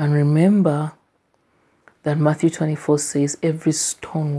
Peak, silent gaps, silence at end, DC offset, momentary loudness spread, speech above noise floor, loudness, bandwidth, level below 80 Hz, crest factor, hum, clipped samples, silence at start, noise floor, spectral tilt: -2 dBFS; none; 0 s; under 0.1%; 9 LU; 46 dB; -20 LUFS; 11 kHz; -64 dBFS; 16 dB; none; under 0.1%; 0 s; -64 dBFS; -6 dB/octave